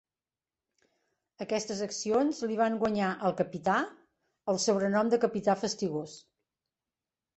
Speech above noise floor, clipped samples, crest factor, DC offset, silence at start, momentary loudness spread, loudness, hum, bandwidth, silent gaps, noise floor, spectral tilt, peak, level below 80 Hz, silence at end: over 61 dB; under 0.1%; 18 dB; under 0.1%; 1.4 s; 9 LU; -30 LUFS; none; 8.4 kHz; none; under -90 dBFS; -4.5 dB/octave; -14 dBFS; -70 dBFS; 1.2 s